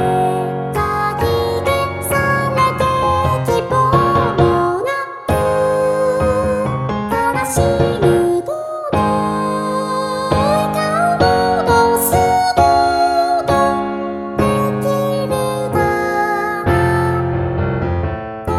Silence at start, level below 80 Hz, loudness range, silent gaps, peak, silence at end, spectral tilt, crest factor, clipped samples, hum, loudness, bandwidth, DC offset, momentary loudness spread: 0 s; -34 dBFS; 3 LU; none; 0 dBFS; 0 s; -6 dB/octave; 16 dB; under 0.1%; none; -16 LUFS; 16.5 kHz; under 0.1%; 6 LU